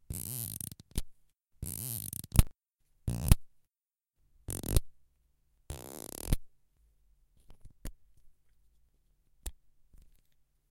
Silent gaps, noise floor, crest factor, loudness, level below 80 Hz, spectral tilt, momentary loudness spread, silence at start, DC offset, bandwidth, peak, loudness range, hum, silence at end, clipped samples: none; under -90 dBFS; 32 dB; -35 LUFS; -40 dBFS; -4.5 dB/octave; 19 LU; 0.1 s; under 0.1%; 17 kHz; -4 dBFS; 21 LU; none; 1.15 s; under 0.1%